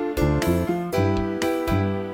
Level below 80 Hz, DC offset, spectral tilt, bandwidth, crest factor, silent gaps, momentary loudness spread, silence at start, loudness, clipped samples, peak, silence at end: -36 dBFS; under 0.1%; -6.5 dB/octave; 17 kHz; 14 dB; none; 3 LU; 0 s; -23 LUFS; under 0.1%; -8 dBFS; 0 s